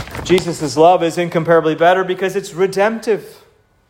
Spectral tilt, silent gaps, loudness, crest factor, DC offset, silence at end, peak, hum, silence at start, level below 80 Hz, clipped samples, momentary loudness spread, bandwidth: -5 dB/octave; none; -15 LUFS; 14 dB; under 0.1%; 0.55 s; 0 dBFS; none; 0 s; -46 dBFS; under 0.1%; 8 LU; 16.5 kHz